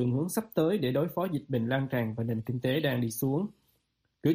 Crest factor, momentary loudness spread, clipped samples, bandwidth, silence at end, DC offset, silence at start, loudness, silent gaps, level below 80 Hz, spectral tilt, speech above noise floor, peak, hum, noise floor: 16 dB; 4 LU; under 0.1%; 15.5 kHz; 0 s; under 0.1%; 0 s; -30 LUFS; none; -66 dBFS; -6.5 dB/octave; 46 dB; -14 dBFS; none; -76 dBFS